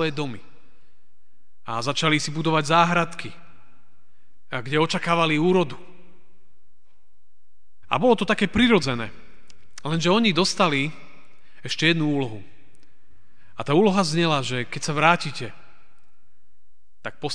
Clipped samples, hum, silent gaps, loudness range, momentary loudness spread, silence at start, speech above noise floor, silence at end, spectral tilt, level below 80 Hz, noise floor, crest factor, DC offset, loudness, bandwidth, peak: under 0.1%; none; none; 3 LU; 18 LU; 0 s; 49 dB; 0 s; -5 dB/octave; -54 dBFS; -71 dBFS; 24 dB; 2%; -22 LUFS; 10 kHz; -2 dBFS